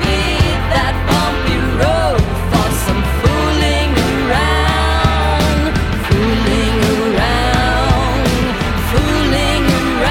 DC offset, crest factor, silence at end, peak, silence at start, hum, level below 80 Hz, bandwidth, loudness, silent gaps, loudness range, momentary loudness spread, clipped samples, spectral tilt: under 0.1%; 12 dB; 0 s; -2 dBFS; 0 s; none; -20 dBFS; 17 kHz; -14 LUFS; none; 1 LU; 2 LU; under 0.1%; -5.5 dB/octave